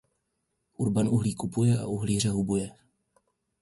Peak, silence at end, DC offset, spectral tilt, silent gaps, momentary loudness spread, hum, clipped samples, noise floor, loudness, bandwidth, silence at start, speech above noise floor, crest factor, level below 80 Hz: -14 dBFS; 0.9 s; under 0.1%; -6.5 dB/octave; none; 6 LU; none; under 0.1%; -79 dBFS; -27 LUFS; 11.5 kHz; 0.8 s; 52 dB; 16 dB; -54 dBFS